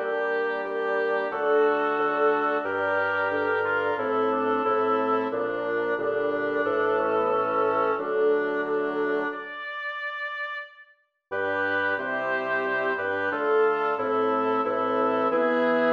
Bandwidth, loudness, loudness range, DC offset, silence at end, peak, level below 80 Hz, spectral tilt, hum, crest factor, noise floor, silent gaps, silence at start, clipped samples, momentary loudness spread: 5.6 kHz; -25 LUFS; 4 LU; under 0.1%; 0 s; -12 dBFS; -72 dBFS; -6.5 dB/octave; none; 14 dB; -58 dBFS; none; 0 s; under 0.1%; 8 LU